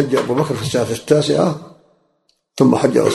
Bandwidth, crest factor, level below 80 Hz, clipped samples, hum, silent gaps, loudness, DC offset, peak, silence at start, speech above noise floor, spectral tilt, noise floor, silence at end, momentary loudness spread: 12.5 kHz; 16 dB; -52 dBFS; under 0.1%; none; none; -16 LUFS; under 0.1%; 0 dBFS; 0 s; 49 dB; -6 dB/octave; -64 dBFS; 0 s; 6 LU